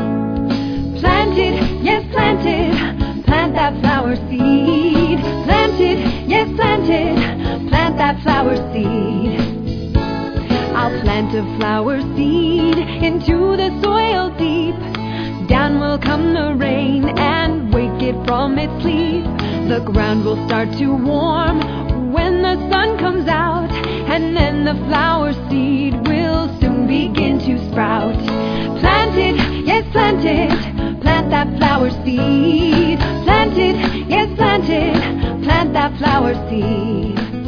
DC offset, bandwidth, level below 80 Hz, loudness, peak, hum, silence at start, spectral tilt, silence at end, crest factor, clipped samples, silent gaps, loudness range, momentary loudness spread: under 0.1%; 5.4 kHz; -28 dBFS; -16 LUFS; 0 dBFS; none; 0 s; -7.5 dB/octave; 0 s; 16 dB; under 0.1%; none; 3 LU; 5 LU